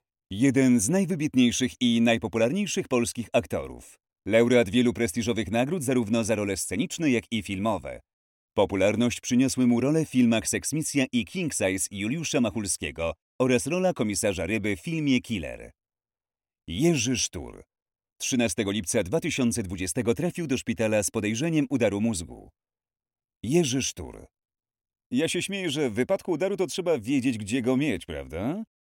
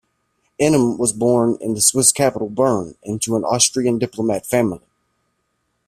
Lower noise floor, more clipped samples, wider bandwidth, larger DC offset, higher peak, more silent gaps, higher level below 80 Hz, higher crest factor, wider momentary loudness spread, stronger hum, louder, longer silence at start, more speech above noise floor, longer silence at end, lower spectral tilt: first, under -90 dBFS vs -70 dBFS; neither; about the same, 17 kHz vs 15.5 kHz; neither; second, -8 dBFS vs 0 dBFS; first, 8.13-8.49 s, 13.22-13.39 s, 17.82-17.86 s, 23.36-23.41 s, 25.06-25.10 s vs none; about the same, -54 dBFS vs -54 dBFS; about the same, 18 dB vs 18 dB; about the same, 10 LU vs 9 LU; neither; second, -26 LUFS vs -17 LUFS; second, 0.3 s vs 0.6 s; first, over 64 dB vs 52 dB; second, 0.3 s vs 1.1 s; about the same, -4.5 dB/octave vs -4 dB/octave